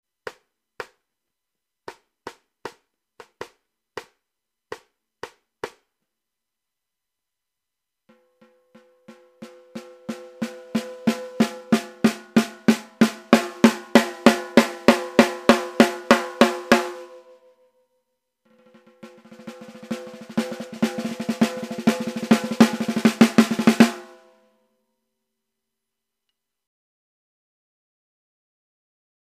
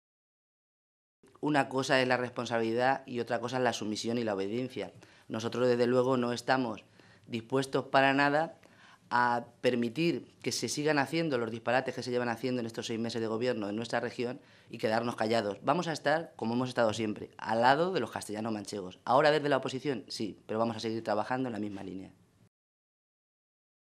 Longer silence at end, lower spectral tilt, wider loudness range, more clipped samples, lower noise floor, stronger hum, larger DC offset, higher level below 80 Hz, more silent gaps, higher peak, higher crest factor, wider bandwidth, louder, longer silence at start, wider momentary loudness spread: first, 5.35 s vs 1.8 s; about the same, -4.5 dB/octave vs -5 dB/octave; first, 24 LU vs 4 LU; neither; first, -85 dBFS vs -59 dBFS; neither; neither; first, -62 dBFS vs -78 dBFS; neither; first, 0 dBFS vs -10 dBFS; about the same, 24 dB vs 22 dB; first, 15.5 kHz vs 13.5 kHz; first, -20 LUFS vs -31 LUFS; second, 0.25 s vs 1.4 s; first, 24 LU vs 12 LU